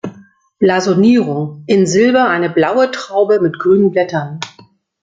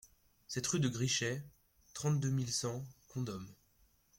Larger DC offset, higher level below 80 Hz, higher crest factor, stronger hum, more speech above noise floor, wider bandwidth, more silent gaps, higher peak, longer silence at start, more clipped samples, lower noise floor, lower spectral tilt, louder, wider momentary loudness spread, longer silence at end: neither; first, -56 dBFS vs -68 dBFS; second, 12 dB vs 18 dB; neither; about the same, 34 dB vs 35 dB; second, 9.2 kHz vs 16.5 kHz; neither; first, -2 dBFS vs -20 dBFS; second, 0.05 s vs 0.5 s; neither; second, -47 dBFS vs -71 dBFS; first, -6 dB/octave vs -4 dB/octave; first, -13 LUFS vs -37 LUFS; second, 11 LU vs 14 LU; about the same, 0.55 s vs 0.65 s